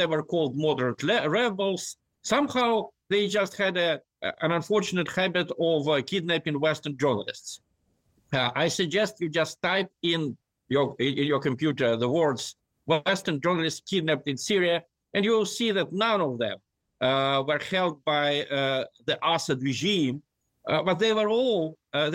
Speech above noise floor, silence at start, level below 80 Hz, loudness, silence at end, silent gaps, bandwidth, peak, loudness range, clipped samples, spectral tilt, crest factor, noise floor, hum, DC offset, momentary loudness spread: 45 dB; 0 s; -68 dBFS; -26 LUFS; 0 s; none; 16.5 kHz; -12 dBFS; 2 LU; under 0.1%; -4.5 dB/octave; 14 dB; -71 dBFS; none; under 0.1%; 7 LU